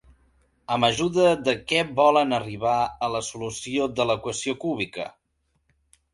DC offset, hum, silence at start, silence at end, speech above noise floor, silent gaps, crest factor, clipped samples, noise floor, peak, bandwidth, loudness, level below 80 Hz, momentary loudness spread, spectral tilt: under 0.1%; none; 0.7 s; 1.05 s; 49 dB; none; 20 dB; under 0.1%; -72 dBFS; -4 dBFS; 11.5 kHz; -24 LUFS; -56 dBFS; 11 LU; -4 dB/octave